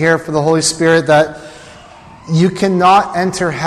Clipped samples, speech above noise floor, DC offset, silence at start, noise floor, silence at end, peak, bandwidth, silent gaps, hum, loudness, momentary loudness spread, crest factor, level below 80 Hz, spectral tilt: under 0.1%; 25 dB; under 0.1%; 0 s; -38 dBFS; 0 s; -2 dBFS; 13.5 kHz; none; none; -12 LUFS; 8 LU; 12 dB; -46 dBFS; -5 dB/octave